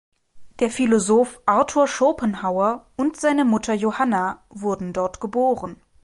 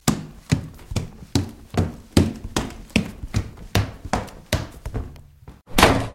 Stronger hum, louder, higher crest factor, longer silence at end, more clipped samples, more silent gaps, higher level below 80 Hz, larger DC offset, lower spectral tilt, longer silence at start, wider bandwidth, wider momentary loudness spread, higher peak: neither; first, -21 LUFS vs -25 LUFS; second, 16 dB vs 24 dB; first, 0.3 s vs 0 s; neither; neither; second, -54 dBFS vs -34 dBFS; neither; about the same, -5 dB/octave vs -5 dB/octave; first, 0.35 s vs 0.05 s; second, 11.5 kHz vs 16.5 kHz; second, 8 LU vs 12 LU; second, -4 dBFS vs 0 dBFS